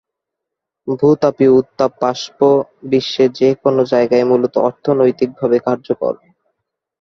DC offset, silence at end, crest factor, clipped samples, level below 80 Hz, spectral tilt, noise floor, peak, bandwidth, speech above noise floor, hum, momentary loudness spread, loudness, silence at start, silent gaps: under 0.1%; 0.9 s; 14 dB; under 0.1%; -58 dBFS; -6.5 dB/octave; -81 dBFS; -2 dBFS; 6.8 kHz; 67 dB; none; 7 LU; -15 LUFS; 0.85 s; none